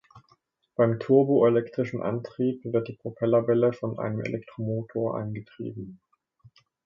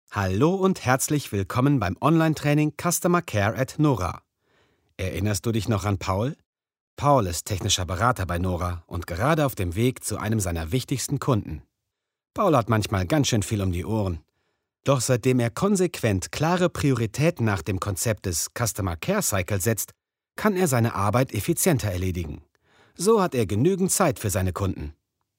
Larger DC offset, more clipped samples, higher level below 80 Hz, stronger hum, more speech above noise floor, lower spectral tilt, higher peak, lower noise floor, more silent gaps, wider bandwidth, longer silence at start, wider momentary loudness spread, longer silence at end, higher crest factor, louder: neither; neither; second, -66 dBFS vs -46 dBFS; neither; second, 41 dB vs 60 dB; first, -9.5 dB/octave vs -5 dB/octave; second, -8 dBFS vs -4 dBFS; second, -66 dBFS vs -83 dBFS; second, none vs 6.46-6.53 s, 6.80-6.97 s; second, 7 kHz vs 16 kHz; about the same, 0.15 s vs 0.1 s; first, 16 LU vs 8 LU; first, 0.9 s vs 0.45 s; about the same, 18 dB vs 20 dB; about the same, -26 LUFS vs -24 LUFS